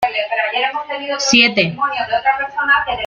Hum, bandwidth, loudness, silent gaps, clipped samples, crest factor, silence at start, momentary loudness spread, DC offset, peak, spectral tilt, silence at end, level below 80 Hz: none; 13.5 kHz; -15 LUFS; none; under 0.1%; 16 dB; 0 s; 9 LU; under 0.1%; 0 dBFS; -2.5 dB/octave; 0 s; -50 dBFS